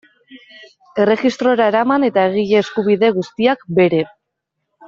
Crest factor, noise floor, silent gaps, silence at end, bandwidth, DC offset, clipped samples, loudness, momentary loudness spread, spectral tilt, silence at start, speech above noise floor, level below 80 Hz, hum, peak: 14 dB; -76 dBFS; none; 0.8 s; 7.6 kHz; under 0.1%; under 0.1%; -16 LUFS; 4 LU; -6.5 dB/octave; 0.3 s; 61 dB; -60 dBFS; none; -2 dBFS